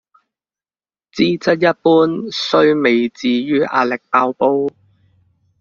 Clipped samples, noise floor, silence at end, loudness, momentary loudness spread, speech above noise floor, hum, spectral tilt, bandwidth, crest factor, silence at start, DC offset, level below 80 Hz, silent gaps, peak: under 0.1%; under -90 dBFS; 0.9 s; -15 LUFS; 6 LU; over 75 dB; none; -6 dB/octave; 7.2 kHz; 16 dB; 1.15 s; under 0.1%; -60 dBFS; none; -2 dBFS